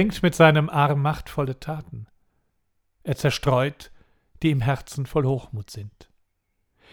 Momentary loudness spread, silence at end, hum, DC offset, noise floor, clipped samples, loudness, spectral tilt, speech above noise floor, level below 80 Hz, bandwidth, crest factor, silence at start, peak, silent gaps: 21 LU; 1.05 s; none; under 0.1%; -73 dBFS; under 0.1%; -23 LUFS; -6.5 dB/octave; 50 dB; -48 dBFS; 17 kHz; 22 dB; 0 s; -2 dBFS; none